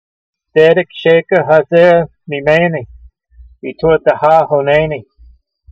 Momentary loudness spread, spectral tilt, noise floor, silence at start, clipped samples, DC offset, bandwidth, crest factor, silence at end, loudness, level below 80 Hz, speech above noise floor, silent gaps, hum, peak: 12 LU; -7.5 dB/octave; -44 dBFS; 0.55 s; under 0.1%; under 0.1%; 7.2 kHz; 12 dB; 0.7 s; -11 LUFS; -42 dBFS; 34 dB; none; none; 0 dBFS